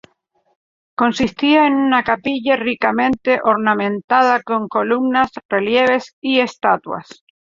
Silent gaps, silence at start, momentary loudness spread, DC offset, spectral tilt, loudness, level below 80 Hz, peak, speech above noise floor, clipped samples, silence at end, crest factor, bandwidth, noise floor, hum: 4.04-4.08 s, 5.45-5.49 s, 6.13-6.22 s; 1 s; 6 LU; under 0.1%; -5 dB/octave; -16 LUFS; -54 dBFS; -2 dBFS; 47 dB; under 0.1%; 0.4 s; 16 dB; 7.6 kHz; -63 dBFS; none